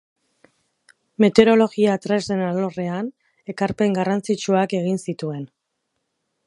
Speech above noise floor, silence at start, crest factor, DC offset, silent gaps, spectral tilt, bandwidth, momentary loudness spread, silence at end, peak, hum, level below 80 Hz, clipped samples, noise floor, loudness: 56 dB; 1.2 s; 22 dB; under 0.1%; none; -6 dB/octave; 11.5 kHz; 18 LU; 1 s; 0 dBFS; none; -62 dBFS; under 0.1%; -76 dBFS; -20 LUFS